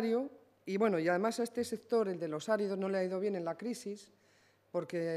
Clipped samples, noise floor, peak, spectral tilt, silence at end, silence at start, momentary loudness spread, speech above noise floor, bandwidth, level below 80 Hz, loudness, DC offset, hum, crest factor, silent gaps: under 0.1%; -69 dBFS; -18 dBFS; -5.5 dB/octave; 0 s; 0 s; 11 LU; 34 dB; 14.5 kHz; -86 dBFS; -35 LUFS; under 0.1%; none; 18 dB; none